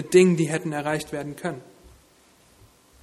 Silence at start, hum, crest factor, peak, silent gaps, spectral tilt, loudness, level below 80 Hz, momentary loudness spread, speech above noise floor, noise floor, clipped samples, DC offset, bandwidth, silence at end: 0 s; none; 20 dB; -4 dBFS; none; -6 dB/octave; -24 LUFS; -60 dBFS; 15 LU; 35 dB; -57 dBFS; under 0.1%; under 0.1%; 13.5 kHz; 1.4 s